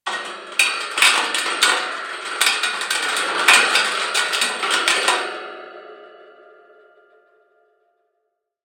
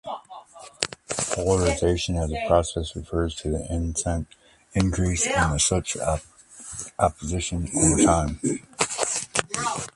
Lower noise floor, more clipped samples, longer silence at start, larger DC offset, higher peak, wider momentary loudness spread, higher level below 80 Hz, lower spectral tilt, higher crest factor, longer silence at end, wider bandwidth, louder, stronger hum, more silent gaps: first, -74 dBFS vs -44 dBFS; neither; about the same, 0.05 s vs 0.05 s; neither; about the same, 0 dBFS vs -2 dBFS; first, 15 LU vs 11 LU; second, -76 dBFS vs -36 dBFS; second, 2 dB/octave vs -4 dB/octave; about the same, 22 dB vs 24 dB; first, 2.35 s vs 0.05 s; first, 16.5 kHz vs 11.5 kHz; first, -17 LUFS vs -24 LUFS; neither; neither